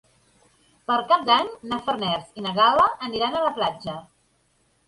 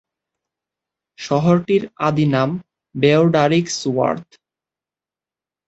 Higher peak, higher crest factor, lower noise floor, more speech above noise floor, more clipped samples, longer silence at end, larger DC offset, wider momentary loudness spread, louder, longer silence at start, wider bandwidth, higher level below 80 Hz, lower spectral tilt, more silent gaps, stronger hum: second, -6 dBFS vs -2 dBFS; about the same, 18 dB vs 18 dB; second, -66 dBFS vs -90 dBFS; second, 43 dB vs 73 dB; neither; second, 0.85 s vs 1.45 s; neither; about the same, 14 LU vs 13 LU; second, -22 LUFS vs -17 LUFS; second, 0.9 s vs 1.2 s; first, 11.5 kHz vs 8.2 kHz; about the same, -60 dBFS vs -58 dBFS; about the same, -5 dB/octave vs -6 dB/octave; neither; neither